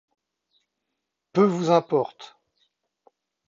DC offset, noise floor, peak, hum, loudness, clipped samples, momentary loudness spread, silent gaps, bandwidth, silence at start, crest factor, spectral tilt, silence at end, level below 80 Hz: under 0.1%; -82 dBFS; -4 dBFS; none; -23 LUFS; under 0.1%; 23 LU; none; 7.6 kHz; 1.35 s; 22 dB; -7 dB/octave; 1.2 s; -76 dBFS